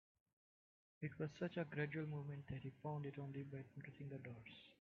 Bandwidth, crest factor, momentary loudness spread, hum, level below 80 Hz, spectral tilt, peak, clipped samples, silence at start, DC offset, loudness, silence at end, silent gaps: 7 kHz; 20 dB; 10 LU; none; -78 dBFS; -6.5 dB/octave; -30 dBFS; under 0.1%; 1 s; under 0.1%; -50 LUFS; 0.1 s; none